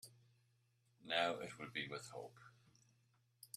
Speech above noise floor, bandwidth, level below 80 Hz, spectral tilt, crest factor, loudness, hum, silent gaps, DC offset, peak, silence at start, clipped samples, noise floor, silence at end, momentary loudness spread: 34 dB; 14 kHz; -86 dBFS; -3 dB/octave; 26 dB; -44 LUFS; none; none; under 0.1%; -22 dBFS; 0.05 s; under 0.1%; -78 dBFS; 0.1 s; 23 LU